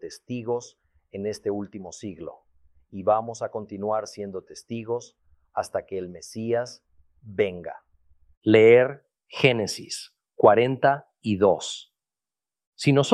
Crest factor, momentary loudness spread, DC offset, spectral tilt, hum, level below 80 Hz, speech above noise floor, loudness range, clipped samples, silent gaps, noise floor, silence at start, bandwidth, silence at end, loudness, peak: 24 dB; 19 LU; under 0.1%; -5.5 dB/octave; none; -66 dBFS; over 66 dB; 11 LU; under 0.1%; 8.37-8.41 s, 12.67-12.72 s; under -90 dBFS; 0.05 s; 12.5 kHz; 0 s; -24 LUFS; -2 dBFS